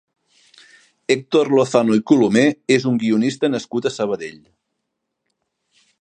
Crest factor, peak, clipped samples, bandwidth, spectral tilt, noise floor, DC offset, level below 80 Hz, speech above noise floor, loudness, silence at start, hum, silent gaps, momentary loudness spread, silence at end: 18 dB; 0 dBFS; under 0.1%; 9.8 kHz; -5.5 dB/octave; -77 dBFS; under 0.1%; -64 dBFS; 60 dB; -18 LUFS; 1.1 s; none; none; 9 LU; 1.7 s